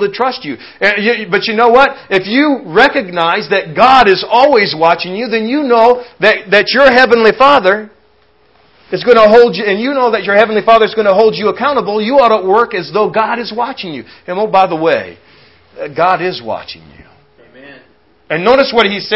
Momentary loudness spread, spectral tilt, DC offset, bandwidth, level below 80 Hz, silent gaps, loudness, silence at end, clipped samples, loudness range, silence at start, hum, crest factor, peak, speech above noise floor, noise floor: 12 LU; -5.5 dB/octave; under 0.1%; 8 kHz; -48 dBFS; none; -10 LUFS; 0 s; 0.8%; 7 LU; 0 s; none; 12 dB; 0 dBFS; 41 dB; -51 dBFS